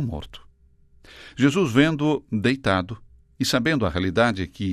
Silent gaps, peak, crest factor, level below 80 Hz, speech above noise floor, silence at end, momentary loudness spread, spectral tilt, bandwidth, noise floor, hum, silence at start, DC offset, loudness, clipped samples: none; -4 dBFS; 20 dB; -48 dBFS; 33 dB; 0 s; 16 LU; -5.5 dB/octave; 13.5 kHz; -55 dBFS; none; 0 s; under 0.1%; -22 LUFS; under 0.1%